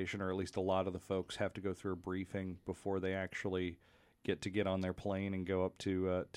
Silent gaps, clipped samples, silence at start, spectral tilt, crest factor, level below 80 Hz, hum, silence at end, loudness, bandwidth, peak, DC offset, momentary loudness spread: none; under 0.1%; 0 s; -6.5 dB/octave; 18 dB; -66 dBFS; none; 0.1 s; -39 LUFS; 12 kHz; -20 dBFS; under 0.1%; 7 LU